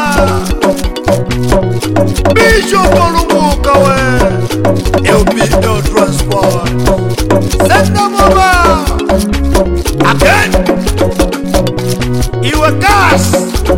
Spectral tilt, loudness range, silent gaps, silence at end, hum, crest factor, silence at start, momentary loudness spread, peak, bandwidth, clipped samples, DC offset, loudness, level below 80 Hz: -5 dB/octave; 2 LU; none; 0 s; none; 10 dB; 0 s; 6 LU; 0 dBFS; 17 kHz; 0.5%; 3%; -10 LUFS; -18 dBFS